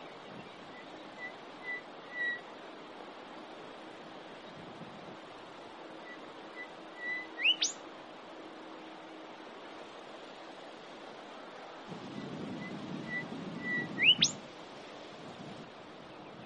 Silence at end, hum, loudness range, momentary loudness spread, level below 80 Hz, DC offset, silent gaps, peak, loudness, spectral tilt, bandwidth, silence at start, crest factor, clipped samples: 0 s; none; 16 LU; 19 LU; -78 dBFS; under 0.1%; none; -14 dBFS; -34 LUFS; -1.5 dB/octave; 11 kHz; 0 s; 26 dB; under 0.1%